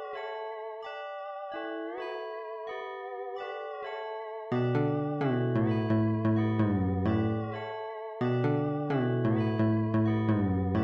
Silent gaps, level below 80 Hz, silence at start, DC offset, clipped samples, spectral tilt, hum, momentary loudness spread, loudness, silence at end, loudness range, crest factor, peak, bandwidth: none; -60 dBFS; 0 s; under 0.1%; under 0.1%; -10 dB/octave; none; 11 LU; -31 LUFS; 0 s; 9 LU; 12 dB; -18 dBFS; 5.6 kHz